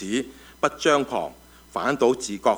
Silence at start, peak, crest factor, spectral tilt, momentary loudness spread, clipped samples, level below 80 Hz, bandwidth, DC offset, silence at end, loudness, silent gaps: 0 s; -4 dBFS; 20 dB; -3.5 dB/octave; 13 LU; under 0.1%; -56 dBFS; over 20 kHz; under 0.1%; 0 s; -24 LUFS; none